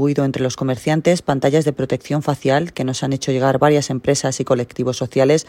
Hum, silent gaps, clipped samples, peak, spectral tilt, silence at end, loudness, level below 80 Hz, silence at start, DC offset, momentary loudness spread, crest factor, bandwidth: none; none; under 0.1%; -2 dBFS; -5.5 dB/octave; 0.05 s; -18 LUFS; -52 dBFS; 0 s; under 0.1%; 6 LU; 16 dB; 15.5 kHz